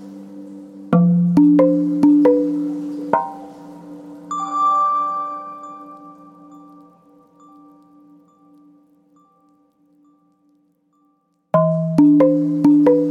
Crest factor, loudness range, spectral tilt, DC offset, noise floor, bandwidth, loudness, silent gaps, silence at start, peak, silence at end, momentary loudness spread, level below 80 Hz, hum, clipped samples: 18 dB; 11 LU; -10 dB/octave; under 0.1%; -63 dBFS; 7.4 kHz; -16 LUFS; none; 0 s; -2 dBFS; 0 s; 24 LU; -64 dBFS; none; under 0.1%